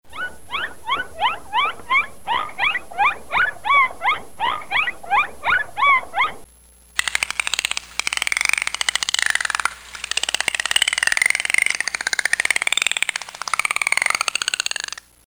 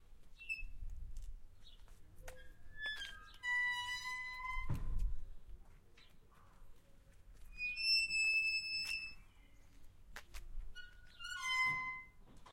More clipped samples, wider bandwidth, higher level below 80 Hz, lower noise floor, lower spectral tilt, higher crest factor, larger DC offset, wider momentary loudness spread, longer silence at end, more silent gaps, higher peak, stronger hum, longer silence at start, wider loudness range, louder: neither; first, over 20 kHz vs 16.5 kHz; about the same, -54 dBFS vs -50 dBFS; second, -50 dBFS vs -61 dBFS; second, 1.5 dB/octave vs -1.5 dB/octave; about the same, 20 dB vs 16 dB; neither; second, 8 LU vs 25 LU; about the same, 0 s vs 0 s; neither; first, -2 dBFS vs -26 dBFS; neither; about the same, 0.1 s vs 0 s; second, 2 LU vs 12 LU; first, -20 LUFS vs -38 LUFS